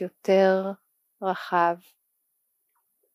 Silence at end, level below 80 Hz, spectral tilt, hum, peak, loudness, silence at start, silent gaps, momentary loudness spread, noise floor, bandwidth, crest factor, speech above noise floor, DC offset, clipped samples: 1.4 s; under -90 dBFS; -6.5 dB/octave; none; -8 dBFS; -24 LUFS; 0 s; none; 15 LU; -75 dBFS; 15 kHz; 18 dB; 51 dB; under 0.1%; under 0.1%